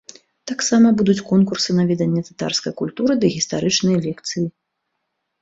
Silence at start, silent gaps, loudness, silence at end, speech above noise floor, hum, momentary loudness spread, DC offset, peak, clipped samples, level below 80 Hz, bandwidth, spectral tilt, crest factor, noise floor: 0.45 s; none; -19 LUFS; 0.9 s; 57 dB; none; 11 LU; under 0.1%; -4 dBFS; under 0.1%; -56 dBFS; 8 kHz; -5 dB/octave; 16 dB; -75 dBFS